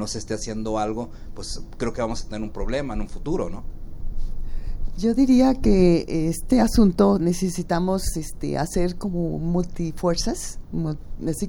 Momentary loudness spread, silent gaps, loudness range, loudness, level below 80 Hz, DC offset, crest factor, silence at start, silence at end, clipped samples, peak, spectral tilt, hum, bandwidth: 19 LU; none; 10 LU; -23 LUFS; -30 dBFS; under 0.1%; 18 dB; 0 s; 0 s; under 0.1%; -4 dBFS; -6 dB/octave; none; 17.5 kHz